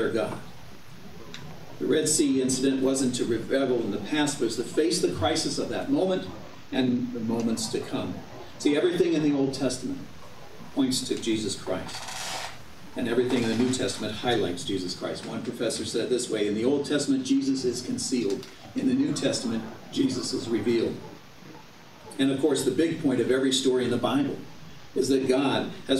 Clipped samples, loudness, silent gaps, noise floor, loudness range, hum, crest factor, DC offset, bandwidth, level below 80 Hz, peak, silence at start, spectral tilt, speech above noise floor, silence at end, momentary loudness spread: under 0.1%; -27 LUFS; none; -49 dBFS; 3 LU; none; 18 dB; 0.6%; 15 kHz; -58 dBFS; -10 dBFS; 0 s; -4 dB/octave; 23 dB; 0 s; 18 LU